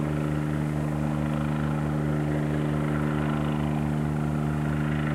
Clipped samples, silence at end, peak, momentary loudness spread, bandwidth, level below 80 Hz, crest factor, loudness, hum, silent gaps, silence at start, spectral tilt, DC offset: under 0.1%; 0 s; -14 dBFS; 1 LU; 12 kHz; -40 dBFS; 12 dB; -27 LUFS; none; none; 0 s; -8 dB/octave; under 0.1%